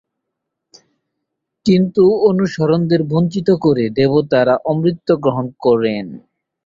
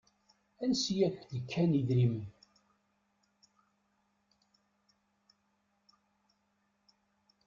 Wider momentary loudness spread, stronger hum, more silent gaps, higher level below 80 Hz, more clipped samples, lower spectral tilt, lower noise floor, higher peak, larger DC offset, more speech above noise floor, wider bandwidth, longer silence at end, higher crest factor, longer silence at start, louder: second, 6 LU vs 13 LU; neither; neither; first, -54 dBFS vs -70 dBFS; neither; first, -8 dB/octave vs -6.5 dB/octave; about the same, -78 dBFS vs -78 dBFS; first, -2 dBFS vs -18 dBFS; neither; first, 63 dB vs 46 dB; about the same, 7.6 kHz vs 7.6 kHz; second, 0.45 s vs 5.15 s; second, 14 dB vs 20 dB; first, 1.65 s vs 0.6 s; first, -15 LUFS vs -32 LUFS